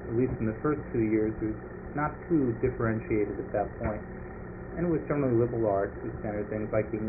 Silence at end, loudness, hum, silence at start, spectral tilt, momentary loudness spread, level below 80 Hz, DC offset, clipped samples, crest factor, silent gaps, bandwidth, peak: 0 s; -30 LUFS; none; 0 s; -6 dB/octave; 11 LU; -46 dBFS; under 0.1%; under 0.1%; 16 dB; none; 2.7 kHz; -14 dBFS